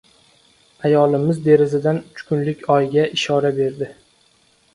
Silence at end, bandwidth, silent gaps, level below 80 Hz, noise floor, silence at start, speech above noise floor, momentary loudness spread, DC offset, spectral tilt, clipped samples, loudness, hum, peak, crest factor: 0.85 s; 11 kHz; none; -60 dBFS; -58 dBFS; 0.85 s; 40 dB; 9 LU; under 0.1%; -6.5 dB/octave; under 0.1%; -18 LUFS; none; -2 dBFS; 18 dB